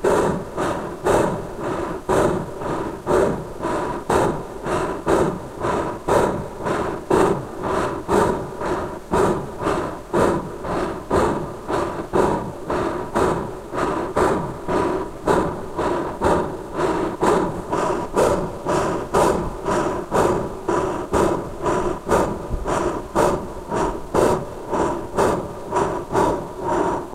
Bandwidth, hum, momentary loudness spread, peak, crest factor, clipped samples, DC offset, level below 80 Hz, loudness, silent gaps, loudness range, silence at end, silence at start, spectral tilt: 16 kHz; none; 7 LU; -4 dBFS; 18 dB; under 0.1%; under 0.1%; -38 dBFS; -22 LUFS; none; 1 LU; 0 s; 0 s; -6 dB/octave